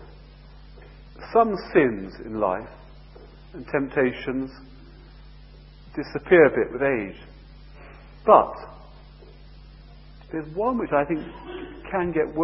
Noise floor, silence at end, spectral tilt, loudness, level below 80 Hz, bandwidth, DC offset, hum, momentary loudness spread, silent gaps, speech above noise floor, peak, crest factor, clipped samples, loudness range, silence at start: -46 dBFS; 0 s; -11 dB/octave; -23 LUFS; -46 dBFS; 5.8 kHz; under 0.1%; none; 20 LU; none; 23 dB; 0 dBFS; 26 dB; under 0.1%; 8 LU; 0 s